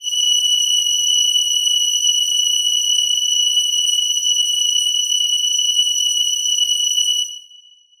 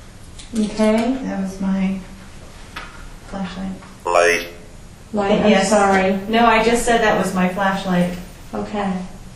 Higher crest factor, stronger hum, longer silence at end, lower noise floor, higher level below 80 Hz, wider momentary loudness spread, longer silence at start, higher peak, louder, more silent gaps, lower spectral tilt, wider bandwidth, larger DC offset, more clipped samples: second, 12 dB vs 18 dB; neither; first, 0.6 s vs 0 s; first, -47 dBFS vs -39 dBFS; second, -66 dBFS vs -38 dBFS; second, 2 LU vs 19 LU; about the same, 0 s vs 0 s; second, -6 dBFS vs 0 dBFS; first, -14 LUFS vs -18 LUFS; neither; second, 8 dB/octave vs -5 dB/octave; first, over 20 kHz vs 14.5 kHz; neither; neither